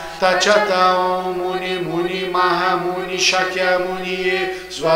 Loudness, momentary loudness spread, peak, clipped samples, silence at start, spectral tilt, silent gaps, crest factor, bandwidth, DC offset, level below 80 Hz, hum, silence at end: -18 LUFS; 8 LU; 0 dBFS; under 0.1%; 0 s; -3 dB/octave; none; 18 dB; 16 kHz; under 0.1%; -50 dBFS; none; 0 s